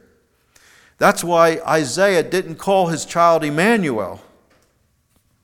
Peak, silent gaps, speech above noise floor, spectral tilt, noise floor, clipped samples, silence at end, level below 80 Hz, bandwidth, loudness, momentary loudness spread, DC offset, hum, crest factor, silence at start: 0 dBFS; none; 46 dB; -4.5 dB/octave; -62 dBFS; under 0.1%; 1.25 s; -58 dBFS; 18.5 kHz; -17 LUFS; 7 LU; under 0.1%; none; 18 dB; 1 s